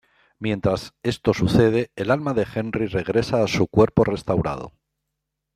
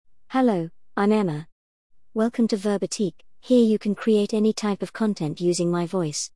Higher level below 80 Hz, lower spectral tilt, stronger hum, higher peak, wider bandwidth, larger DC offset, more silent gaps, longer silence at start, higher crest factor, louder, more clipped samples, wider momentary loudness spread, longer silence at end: first, -46 dBFS vs -64 dBFS; first, -7 dB/octave vs -5.5 dB/octave; neither; first, -2 dBFS vs -8 dBFS; first, 14 kHz vs 12 kHz; second, under 0.1% vs 0.3%; second, none vs 1.52-1.90 s; about the same, 0.4 s vs 0.3 s; about the same, 20 dB vs 16 dB; about the same, -22 LUFS vs -23 LUFS; neither; about the same, 10 LU vs 8 LU; first, 0.85 s vs 0.1 s